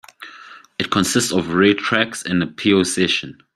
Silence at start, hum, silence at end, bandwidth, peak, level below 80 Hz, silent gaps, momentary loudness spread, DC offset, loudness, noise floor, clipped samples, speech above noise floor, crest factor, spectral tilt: 0.2 s; none; 0.25 s; 15.5 kHz; -2 dBFS; -56 dBFS; none; 16 LU; under 0.1%; -18 LUFS; -42 dBFS; under 0.1%; 24 dB; 18 dB; -4 dB/octave